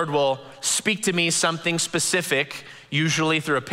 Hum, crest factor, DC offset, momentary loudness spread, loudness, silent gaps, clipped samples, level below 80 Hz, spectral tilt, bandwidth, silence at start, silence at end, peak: none; 18 dB; under 0.1%; 6 LU; -22 LUFS; none; under 0.1%; -66 dBFS; -3 dB/octave; 16 kHz; 0 s; 0 s; -6 dBFS